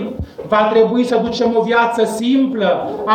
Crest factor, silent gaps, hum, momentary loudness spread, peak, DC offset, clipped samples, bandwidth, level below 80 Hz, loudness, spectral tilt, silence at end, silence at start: 12 dB; none; none; 5 LU; -4 dBFS; under 0.1%; under 0.1%; 15 kHz; -44 dBFS; -15 LUFS; -5.5 dB/octave; 0 s; 0 s